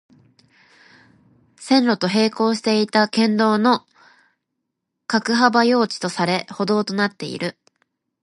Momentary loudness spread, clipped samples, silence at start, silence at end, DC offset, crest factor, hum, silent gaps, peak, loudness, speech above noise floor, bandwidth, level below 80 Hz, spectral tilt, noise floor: 10 LU; under 0.1%; 1.6 s; 0.7 s; under 0.1%; 20 dB; none; none; 0 dBFS; -19 LUFS; 60 dB; 11.5 kHz; -70 dBFS; -5 dB/octave; -78 dBFS